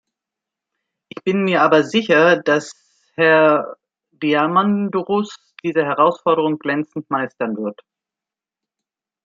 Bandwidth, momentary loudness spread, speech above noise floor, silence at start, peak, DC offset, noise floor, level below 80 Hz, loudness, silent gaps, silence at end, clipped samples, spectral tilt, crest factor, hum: 7.8 kHz; 14 LU; 71 dB; 1.25 s; -2 dBFS; under 0.1%; -88 dBFS; -70 dBFS; -17 LUFS; none; 1.55 s; under 0.1%; -6 dB/octave; 18 dB; none